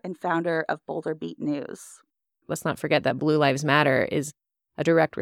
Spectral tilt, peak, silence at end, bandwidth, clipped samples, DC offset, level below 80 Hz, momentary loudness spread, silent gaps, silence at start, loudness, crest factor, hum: -5.5 dB/octave; -6 dBFS; 0 s; 16 kHz; under 0.1%; under 0.1%; -66 dBFS; 13 LU; none; 0.05 s; -25 LUFS; 20 dB; none